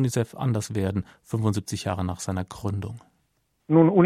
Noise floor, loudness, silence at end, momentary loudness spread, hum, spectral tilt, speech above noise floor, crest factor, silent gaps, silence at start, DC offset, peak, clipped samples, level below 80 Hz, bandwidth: -71 dBFS; -26 LUFS; 0 s; 11 LU; none; -7 dB/octave; 47 dB; 18 dB; none; 0 s; under 0.1%; -6 dBFS; under 0.1%; -54 dBFS; 15 kHz